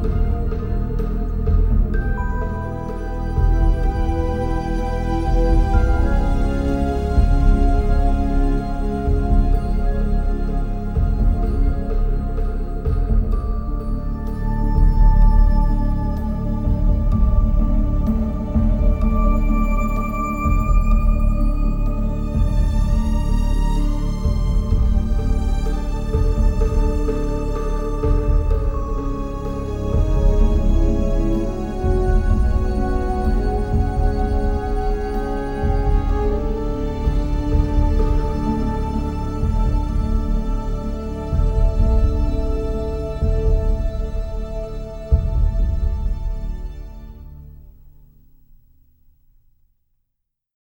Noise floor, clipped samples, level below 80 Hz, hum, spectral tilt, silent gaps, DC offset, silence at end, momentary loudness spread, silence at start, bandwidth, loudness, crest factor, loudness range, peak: -76 dBFS; under 0.1%; -18 dBFS; none; -8.5 dB/octave; none; under 0.1%; 2.95 s; 7 LU; 0 s; 7.4 kHz; -22 LUFS; 14 dB; 3 LU; -4 dBFS